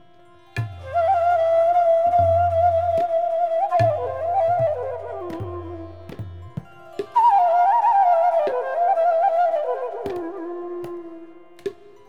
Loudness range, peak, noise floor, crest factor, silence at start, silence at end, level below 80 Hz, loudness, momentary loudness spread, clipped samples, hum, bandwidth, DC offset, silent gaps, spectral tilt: 6 LU; -8 dBFS; -52 dBFS; 12 dB; 0.55 s; 0.35 s; -52 dBFS; -20 LUFS; 19 LU; under 0.1%; none; 6.8 kHz; 0.4%; none; -7.5 dB/octave